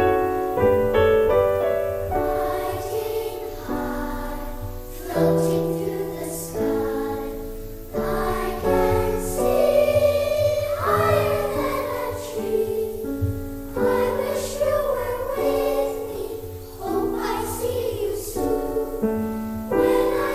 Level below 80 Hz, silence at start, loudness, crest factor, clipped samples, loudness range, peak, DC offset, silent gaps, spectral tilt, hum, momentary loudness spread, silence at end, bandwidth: -38 dBFS; 0 s; -23 LUFS; 16 dB; under 0.1%; 5 LU; -6 dBFS; under 0.1%; none; -6 dB/octave; none; 12 LU; 0 s; 16 kHz